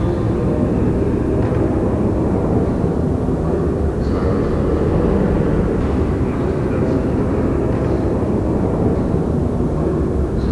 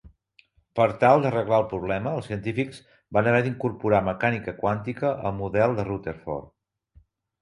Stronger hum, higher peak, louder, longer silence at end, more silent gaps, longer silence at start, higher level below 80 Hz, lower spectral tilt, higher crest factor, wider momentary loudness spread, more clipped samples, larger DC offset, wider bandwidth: neither; about the same, -4 dBFS vs -4 dBFS; first, -18 LUFS vs -25 LUFS; second, 0 s vs 0.95 s; neither; about the same, 0 s vs 0.05 s; first, -24 dBFS vs -52 dBFS; first, -9.5 dB/octave vs -8 dB/octave; second, 12 dB vs 22 dB; second, 2 LU vs 12 LU; neither; first, 0.3% vs under 0.1%; about the same, 11 kHz vs 11 kHz